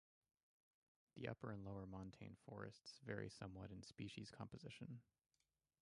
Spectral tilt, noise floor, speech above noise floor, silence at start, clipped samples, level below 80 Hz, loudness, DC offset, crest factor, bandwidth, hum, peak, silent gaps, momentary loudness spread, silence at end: -6 dB/octave; under -90 dBFS; over 36 dB; 1.15 s; under 0.1%; -74 dBFS; -55 LUFS; under 0.1%; 24 dB; 11 kHz; none; -32 dBFS; none; 7 LU; 0.8 s